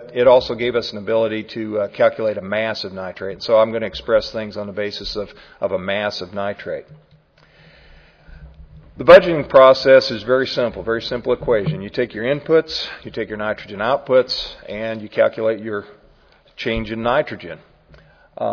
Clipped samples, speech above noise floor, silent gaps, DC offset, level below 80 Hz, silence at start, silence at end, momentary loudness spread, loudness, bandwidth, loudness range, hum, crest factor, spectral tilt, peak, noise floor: under 0.1%; 34 dB; none; under 0.1%; -46 dBFS; 0 s; 0 s; 16 LU; -18 LUFS; 5.4 kHz; 12 LU; none; 18 dB; -6 dB/octave; 0 dBFS; -52 dBFS